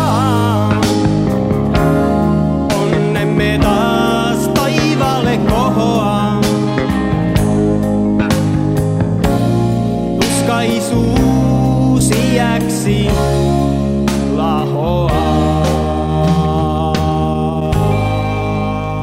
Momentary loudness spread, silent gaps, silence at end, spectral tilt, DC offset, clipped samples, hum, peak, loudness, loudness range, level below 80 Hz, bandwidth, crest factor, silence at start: 3 LU; none; 0 s; -6.5 dB/octave; 0.4%; under 0.1%; none; 0 dBFS; -14 LUFS; 1 LU; -26 dBFS; 16 kHz; 12 dB; 0 s